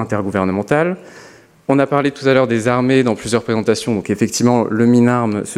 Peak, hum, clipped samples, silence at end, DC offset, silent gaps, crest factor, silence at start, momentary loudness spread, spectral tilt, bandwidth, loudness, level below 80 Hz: 0 dBFS; none; under 0.1%; 0 s; under 0.1%; none; 16 dB; 0 s; 6 LU; -6 dB/octave; 14 kHz; -16 LUFS; -54 dBFS